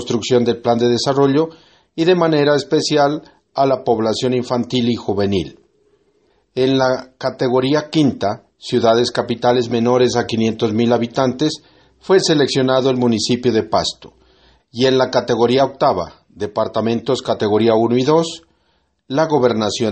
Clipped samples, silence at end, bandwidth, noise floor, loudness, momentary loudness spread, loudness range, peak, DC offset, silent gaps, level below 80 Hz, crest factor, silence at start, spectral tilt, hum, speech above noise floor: under 0.1%; 0 s; 8.8 kHz; -63 dBFS; -16 LUFS; 9 LU; 3 LU; 0 dBFS; under 0.1%; none; -54 dBFS; 16 dB; 0 s; -5.5 dB/octave; none; 47 dB